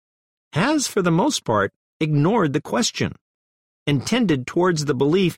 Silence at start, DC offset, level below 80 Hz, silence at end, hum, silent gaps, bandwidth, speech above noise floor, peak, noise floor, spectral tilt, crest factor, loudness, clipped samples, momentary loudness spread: 0.55 s; under 0.1%; -54 dBFS; 0 s; none; 1.76-2.00 s, 3.21-3.86 s; 16 kHz; over 70 dB; -6 dBFS; under -90 dBFS; -5 dB/octave; 14 dB; -21 LUFS; under 0.1%; 8 LU